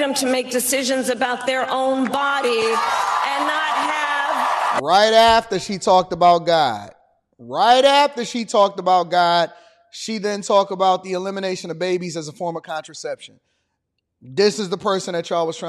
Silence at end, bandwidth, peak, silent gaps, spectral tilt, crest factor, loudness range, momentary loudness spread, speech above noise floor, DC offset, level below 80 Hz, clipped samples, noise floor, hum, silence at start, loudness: 0 s; 13 kHz; -4 dBFS; none; -3 dB/octave; 16 dB; 8 LU; 14 LU; 57 dB; under 0.1%; -56 dBFS; under 0.1%; -75 dBFS; none; 0 s; -18 LUFS